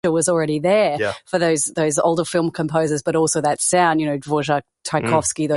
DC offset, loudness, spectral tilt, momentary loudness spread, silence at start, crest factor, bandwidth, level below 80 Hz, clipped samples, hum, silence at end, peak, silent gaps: under 0.1%; -19 LUFS; -4.5 dB/octave; 6 LU; 0.05 s; 16 dB; 12 kHz; -54 dBFS; under 0.1%; none; 0 s; -4 dBFS; none